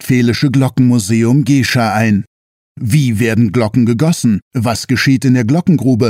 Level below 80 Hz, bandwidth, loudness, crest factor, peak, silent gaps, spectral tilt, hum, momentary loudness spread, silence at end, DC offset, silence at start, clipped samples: -48 dBFS; 16 kHz; -12 LUFS; 12 dB; 0 dBFS; 2.27-2.75 s, 4.42-4.51 s; -6 dB/octave; none; 4 LU; 0 s; under 0.1%; 0 s; under 0.1%